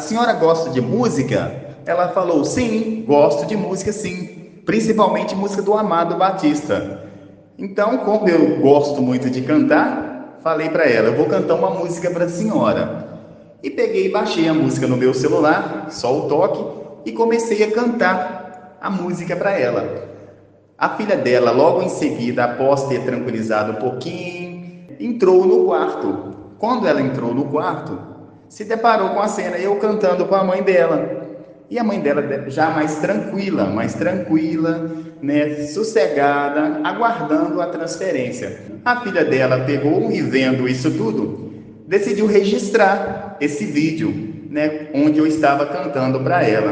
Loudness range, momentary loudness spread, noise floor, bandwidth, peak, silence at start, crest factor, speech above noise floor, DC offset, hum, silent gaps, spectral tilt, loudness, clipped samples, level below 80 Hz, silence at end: 3 LU; 13 LU; -47 dBFS; 9.6 kHz; 0 dBFS; 0 s; 18 dB; 30 dB; under 0.1%; none; none; -6 dB/octave; -18 LUFS; under 0.1%; -58 dBFS; 0 s